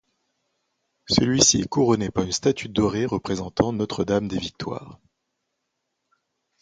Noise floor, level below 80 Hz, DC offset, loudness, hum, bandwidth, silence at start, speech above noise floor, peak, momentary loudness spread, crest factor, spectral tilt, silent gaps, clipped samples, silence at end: -78 dBFS; -48 dBFS; under 0.1%; -22 LUFS; none; 10 kHz; 1.1 s; 56 dB; -2 dBFS; 12 LU; 22 dB; -4 dB/octave; none; under 0.1%; 1.65 s